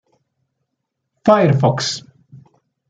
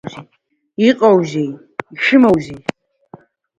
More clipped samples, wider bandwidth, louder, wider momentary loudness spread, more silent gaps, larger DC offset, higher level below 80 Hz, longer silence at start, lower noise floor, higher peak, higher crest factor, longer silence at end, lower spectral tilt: neither; about the same, 9.2 kHz vs 8.8 kHz; about the same, -16 LUFS vs -14 LUFS; second, 10 LU vs 18 LU; neither; neither; second, -60 dBFS vs -52 dBFS; first, 1.25 s vs 0.05 s; first, -76 dBFS vs -43 dBFS; about the same, 0 dBFS vs 0 dBFS; about the same, 20 dB vs 16 dB; second, 0.55 s vs 1 s; about the same, -6 dB/octave vs -6.5 dB/octave